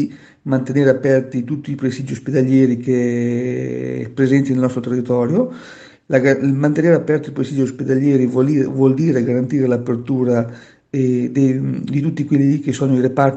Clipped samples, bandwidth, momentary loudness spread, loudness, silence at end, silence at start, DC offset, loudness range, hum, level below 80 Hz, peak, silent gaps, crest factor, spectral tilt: under 0.1%; 8.2 kHz; 8 LU; -17 LUFS; 0 s; 0 s; under 0.1%; 2 LU; none; -58 dBFS; 0 dBFS; none; 16 dB; -8.5 dB/octave